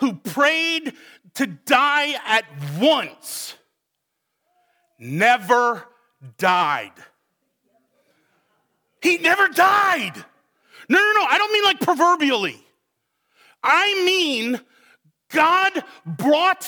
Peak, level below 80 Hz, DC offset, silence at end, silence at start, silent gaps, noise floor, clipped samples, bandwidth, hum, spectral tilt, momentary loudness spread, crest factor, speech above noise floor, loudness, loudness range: -2 dBFS; -80 dBFS; under 0.1%; 0 s; 0 s; none; -78 dBFS; under 0.1%; over 20 kHz; none; -3 dB/octave; 15 LU; 20 dB; 59 dB; -18 LUFS; 6 LU